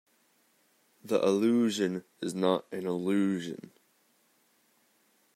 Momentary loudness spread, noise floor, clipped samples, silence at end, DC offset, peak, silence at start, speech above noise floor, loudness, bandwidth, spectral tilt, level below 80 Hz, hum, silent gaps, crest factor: 11 LU; -69 dBFS; under 0.1%; 1.8 s; under 0.1%; -12 dBFS; 1.05 s; 40 dB; -30 LUFS; 15.5 kHz; -5.5 dB/octave; -82 dBFS; none; none; 20 dB